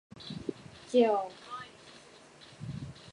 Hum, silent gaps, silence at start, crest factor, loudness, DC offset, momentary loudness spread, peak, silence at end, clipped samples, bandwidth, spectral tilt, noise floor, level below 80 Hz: none; none; 0.15 s; 22 dB; -33 LUFS; under 0.1%; 26 LU; -12 dBFS; 0 s; under 0.1%; 11 kHz; -6 dB/octave; -55 dBFS; -64 dBFS